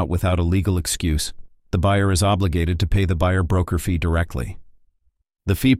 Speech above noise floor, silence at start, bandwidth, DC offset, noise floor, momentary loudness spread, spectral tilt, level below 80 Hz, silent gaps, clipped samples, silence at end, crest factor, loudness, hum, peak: 45 dB; 0 s; 16 kHz; under 0.1%; -64 dBFS; 9 LU; -5.5 dB/octave; -30 dBFS; none; under 0.1%; 0 s; 16 dB; -21 LUFS; none; -4 dBFS